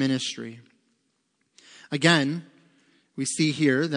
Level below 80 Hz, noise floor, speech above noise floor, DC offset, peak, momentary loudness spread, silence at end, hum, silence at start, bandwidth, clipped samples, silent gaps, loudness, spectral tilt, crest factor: -76 dBFS; -73 dBFS; 49 dB; under 0.1%; -4 dBFS; 17 LU; 0 s; none; 0 s; 10.5 kHz; under 0.1%; none; -24 LUFS; -4.5 dB/octave; 24 dB